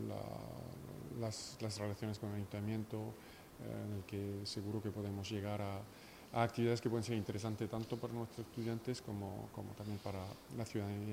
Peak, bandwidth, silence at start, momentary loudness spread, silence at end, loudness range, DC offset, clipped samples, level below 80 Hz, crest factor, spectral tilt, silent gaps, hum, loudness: -20 dBFS; 16 kHz; 0 s; 11 LU; 0 s; 4 LU; under 0.1%; under 0.1%; -70 dBFS; 22 dB; -6 dB/octave; none; none; -43 LUFS